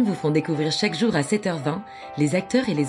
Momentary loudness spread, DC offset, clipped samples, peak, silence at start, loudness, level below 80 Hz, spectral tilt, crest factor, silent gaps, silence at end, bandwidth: 7 LU; under 0.1%; under 0.1%; -6 dBFS; 0 s; -23 LUFS; -60 dBFS; -5.5 dB/octave; 16 dB; none; 0 s; 11.5 kHz